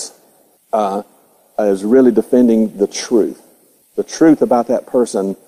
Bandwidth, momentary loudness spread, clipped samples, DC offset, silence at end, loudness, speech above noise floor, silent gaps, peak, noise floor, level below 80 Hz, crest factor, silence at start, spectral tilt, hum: 15.5 kHz; 13 LU; under 0.1%; under 0.1%; 0.1 s; -15 LUFS; 39 dB; none; 0 dBFS; -52 dBFS; -58 dBFS; 14 dB; 0 s; -5.5 dB/octave; none